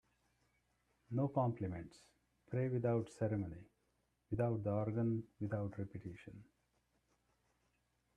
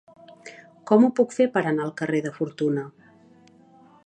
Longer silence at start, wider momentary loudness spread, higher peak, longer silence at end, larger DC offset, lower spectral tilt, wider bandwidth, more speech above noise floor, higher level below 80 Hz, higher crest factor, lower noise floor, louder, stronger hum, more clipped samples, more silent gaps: first, 1.1 s vs 0.45 s; second, 16 LU vs 25 LU; second, -24 dBFS vs -4 dBFS; first, 1.75 s vs 1.15 s; neither; first, -9.5 dB/octave vs -7 dB/octave; about the same, 9.8 kHz vs 9.6 kHz; first, 42 dB vs 32 dB; first, -70 dBFS vs -76 dBFS; about the same, 20 dB vs 20 dB; first, -81 dBFS vs -54 dBFS; second, -40 LUFS vs -23 LUFS; neither; neither; neither